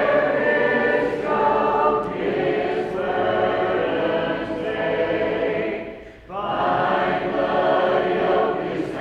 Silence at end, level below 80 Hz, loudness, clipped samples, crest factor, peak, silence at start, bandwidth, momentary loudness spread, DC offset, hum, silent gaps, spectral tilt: 0 s; -50 dBFS; -21 LUFS; under 0.1%; 14 dB; -6 dBFS; 0 s; 8.4 kHz; 7 LU; under 0.1%; none; none; -7 dB/octave